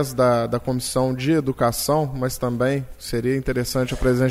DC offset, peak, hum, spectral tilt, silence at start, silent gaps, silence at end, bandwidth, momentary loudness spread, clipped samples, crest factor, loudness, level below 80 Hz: under 0.1%; -6 dBFS; none; -5.5 dB/octave; 0 s; none; 0 s; 16 kHz; 6 LU; under 0.1%; 14 dB; -22 LUFS; -38 dBFS